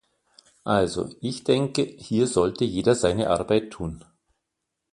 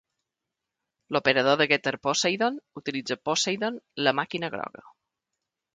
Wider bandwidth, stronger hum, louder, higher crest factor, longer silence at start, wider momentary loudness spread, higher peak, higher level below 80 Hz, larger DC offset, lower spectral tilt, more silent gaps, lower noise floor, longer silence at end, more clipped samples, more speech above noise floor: first, 11.5 kHz vs 9.6 kHz; neither; about the same, -24 LUFS vs -26 LUFS; about the same, 20 dB vs 24 dB; second, 0.65 s vs 1.1 s; about the same, 13 LU vs 11 LU; about the same, -6 dBFS vs -4 dBFS; first, -50 dBFS vs -72 dBFS; neither; first, -5.5 dB/octave vs -3 dB/octave; neither; second, -82 dBFS vs -86 dBFS; about the same, 0.9 s vs 0.85 s; neither; about the same, 58 dB vs 60 dB